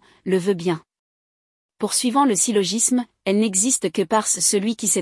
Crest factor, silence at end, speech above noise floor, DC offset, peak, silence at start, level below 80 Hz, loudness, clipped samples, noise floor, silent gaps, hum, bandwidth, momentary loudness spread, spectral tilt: 16 dB; 0 s; over 70 dB; under 0.1%; -4 dBFS; 0.25 s; -68 dBFS; -19 LUFS; under 0.1%; under -90 dBFS; 0.99-1.69 s; none; 12 kHz; 6 LU; -3 dB/octave